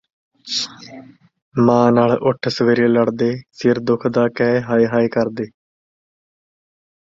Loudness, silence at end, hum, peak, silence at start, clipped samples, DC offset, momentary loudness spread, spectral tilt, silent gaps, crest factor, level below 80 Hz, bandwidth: -17 LUFS; 1.55 s; none; -2 dBFS; 0.45 s; under 0.1%; under 0.1%; 10 LU; -6 dB/octave; 1.42-1.52 s; 16 dB; -56 dBFS; 7.6 kHz